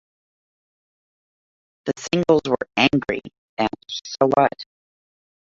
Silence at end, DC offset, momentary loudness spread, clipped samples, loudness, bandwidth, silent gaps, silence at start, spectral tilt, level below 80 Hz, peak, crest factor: 0.95 s; under 0.1%; 14 LU; under 0.1%; -21 LUFS; 7.8 kHz; 3.38-3.57 s; 1.85 s; -5 dB/octave; -56 dBFS; -2 dBFS; 22 dB